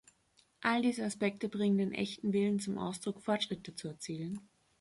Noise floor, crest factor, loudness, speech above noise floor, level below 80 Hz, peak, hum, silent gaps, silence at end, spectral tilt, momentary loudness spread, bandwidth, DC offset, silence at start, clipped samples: -71 dBFS; 18 dB; -35 LUFS; 37 dB; -72 dBFS; -16 dBFS; none; none; 0.4 s; -5 dB/octave; 10 LU; 11.5 kHz; under 0.1%; 0.6 s; under 0.1%